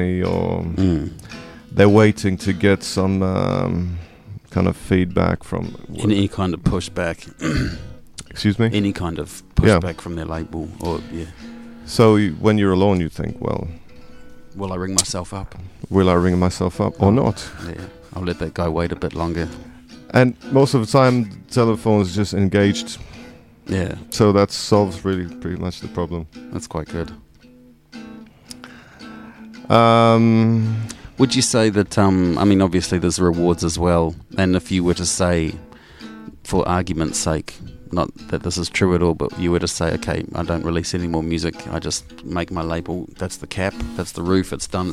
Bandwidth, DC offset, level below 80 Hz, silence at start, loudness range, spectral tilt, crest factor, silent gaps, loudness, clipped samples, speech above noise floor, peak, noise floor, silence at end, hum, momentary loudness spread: 15 kHz; under 0.1%; -38 dBFS; 0 s; 7 LU; -5.5 dB/octave; 20 dB; none; -19 LUFS; under 0.1%; 29 dB; 0 dBFS; -48 dBFS; 0 s; none; 19 LU